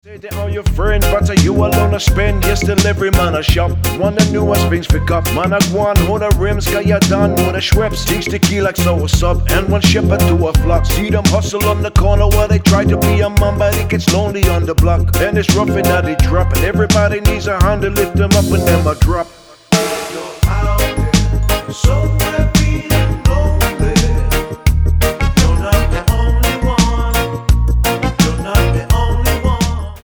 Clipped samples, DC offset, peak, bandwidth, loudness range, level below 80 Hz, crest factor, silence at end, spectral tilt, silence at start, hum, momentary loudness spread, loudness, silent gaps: under 0.1%; under 0.1%; 0 dBFS; over 20 kHz; 2 LU; -18 dBFS; 12 dB; 0.05 s; -5.5 dB/octave; 0.05 s; none; 4 LU; -14 LUFS; none